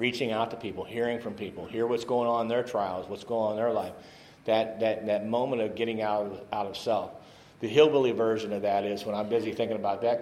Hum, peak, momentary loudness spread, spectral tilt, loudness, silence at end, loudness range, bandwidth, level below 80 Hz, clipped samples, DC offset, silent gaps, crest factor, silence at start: none; -6 dBFS; 10 LU; -5.5 dB/octave; -29 LUFS; 0 s; 3 LU; 13 kHz; -68 dBFS; under 0.1%; under 0.1%; none; 22 dB; 0 s